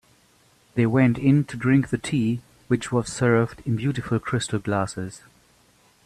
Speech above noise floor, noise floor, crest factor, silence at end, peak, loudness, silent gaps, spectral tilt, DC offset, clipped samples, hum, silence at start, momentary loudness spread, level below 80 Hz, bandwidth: 37 dB; -59 dBFS; 18 dB; 0.85 s; -6 dBFS; -23 LUFS; none; -6.5 dB/octave; under 0.1%; under 0.1%; none; 0.75 s; 9 LU; -54 dBFS; 12.5 kHz